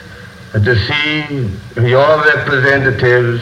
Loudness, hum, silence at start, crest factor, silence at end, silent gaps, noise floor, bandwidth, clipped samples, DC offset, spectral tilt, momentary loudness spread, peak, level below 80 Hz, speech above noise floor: -12 LUFS; none; 0 s; 12 dB; 0 s; none; -33 dBFS; 9.6 kHz; under 0.1%; under 0.1%; -7 dB/octave; 10 LU; 0 dBFS; -40 dBFS; 21 dB